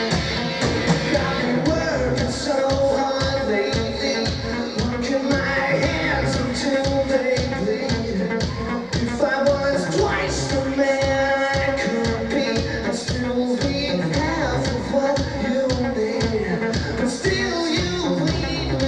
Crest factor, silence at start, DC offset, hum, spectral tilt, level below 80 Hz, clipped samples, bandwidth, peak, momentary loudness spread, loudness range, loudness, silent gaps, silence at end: 16 dB; 0 s; under 0.1%; none; -5 dB/octave; -36 dBFS; under 0.1%; 11 kHz; -6 dBFS; 4 LU; 1 LU; -21 LUFS; none; 0 s